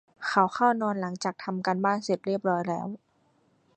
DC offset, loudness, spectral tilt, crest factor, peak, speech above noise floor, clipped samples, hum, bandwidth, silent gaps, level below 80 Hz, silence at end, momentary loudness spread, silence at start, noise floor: under 0.1%; -27 LUFS; -5.5 dB/octave; 22 dB; -6 dBFS; 40 dB; under 0.1%; none; 9.2 kHz; none; -74 dBFS; 0.8 s; 9 LU; 0.2 s; -67 dBFS